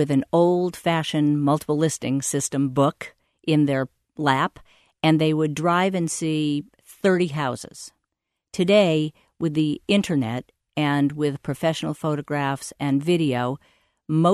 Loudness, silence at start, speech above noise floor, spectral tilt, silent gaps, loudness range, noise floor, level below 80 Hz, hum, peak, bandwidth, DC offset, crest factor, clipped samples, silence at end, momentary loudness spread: -23 LUFS; 0 s; 59 dB; -5.5 dB/octave; none; 2 LU; -81 dBFS; -60 dBFS; none; -6 dBFS; 13.5 kHz; under 0.1%; 18 dB; under 0.1%; 0 s; 10 LU